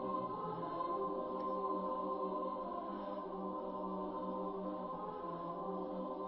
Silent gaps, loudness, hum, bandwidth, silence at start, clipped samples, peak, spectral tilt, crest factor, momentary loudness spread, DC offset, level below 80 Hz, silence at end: none; -42 LUFS; none; 5.6 kHz; 0 s; under 0.1%; -28 dBFS; -7 dB/octave; 14 dB; 5 LU; under 0.1%; -70 dBFS; 0 s